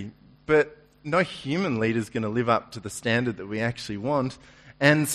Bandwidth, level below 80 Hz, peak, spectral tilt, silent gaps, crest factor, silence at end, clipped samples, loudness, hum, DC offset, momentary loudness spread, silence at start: 13.5 kHz; -58 dBFS; -6 dBFS; -5 dB/octave; none; 20 dB; 0 s; under 0.1%; -26 LUFS; none; under 0.1%; 12 LU; 0 s